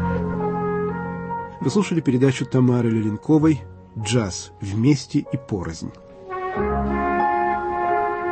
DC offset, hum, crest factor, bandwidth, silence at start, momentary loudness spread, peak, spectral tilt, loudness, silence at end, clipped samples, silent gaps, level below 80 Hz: under 0.1%; none; 16 dB; 8.8 kHz; 0 s; 12 LU; -4 dBFS; -6.5 dB/octave; -22 LUFS; 0 s; under 0.1%; none; -42 dBFS